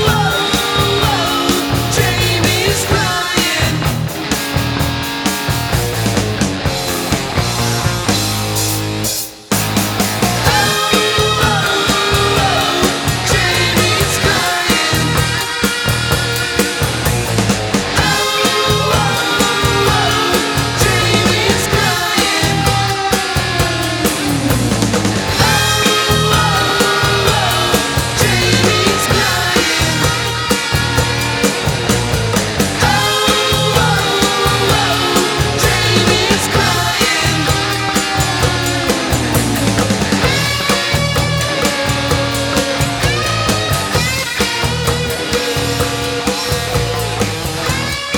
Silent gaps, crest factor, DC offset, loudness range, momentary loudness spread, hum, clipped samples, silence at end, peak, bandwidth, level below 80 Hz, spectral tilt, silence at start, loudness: none; 14 dB; under 0.1%; 4 LU; 5 LU; none; under 0.1%; 0 s; 0 dBFS; over 20 kHz; -30 dBFS; -3.5 dB/octave; 0 s; -13 LUFS